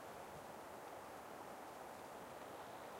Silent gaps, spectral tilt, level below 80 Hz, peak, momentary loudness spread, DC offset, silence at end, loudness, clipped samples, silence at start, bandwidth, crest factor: none; -3.5 dB/octave; -78 dBFS; -40 dBFS; 1 LU; under 0.1%; 0 s; -53 LUFS; under 0.1%; 0 s; 16 kHz; 12 dB